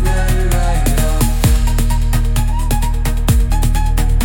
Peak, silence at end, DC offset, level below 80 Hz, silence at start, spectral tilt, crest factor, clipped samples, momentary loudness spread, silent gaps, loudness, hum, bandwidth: -2 dBFS; 0 s; under 0.1%; -14 dBFS; 0 s; -5 dB/octave; 12 dB; under 0.1%; 3 LU; none; -16 LUFS; none; 17.5 kHz